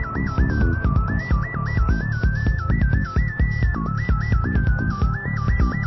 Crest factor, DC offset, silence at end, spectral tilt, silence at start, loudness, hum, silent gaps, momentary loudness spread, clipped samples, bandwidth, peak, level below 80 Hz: 12 dB; under 0.1%; 0 s; -9 dB/octave; 0 s; -22 LUFS; none; none; 3 LU; under 0.1%; 6 kHz; -8 dBFS; -22 dBFS